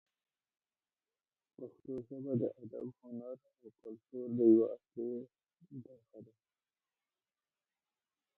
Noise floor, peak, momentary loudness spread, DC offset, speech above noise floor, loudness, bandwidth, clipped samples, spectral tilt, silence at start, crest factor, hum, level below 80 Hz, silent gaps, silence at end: under -90 dBFS; -16 dBFS; 25 LU; under 0.1%; over 53 dB; -36 LUFS; 1.5 kHz; under 0.1%; -13 dB/octave; 1.6 s; 24 dB; none; -84 dBFS; none; 2.15 s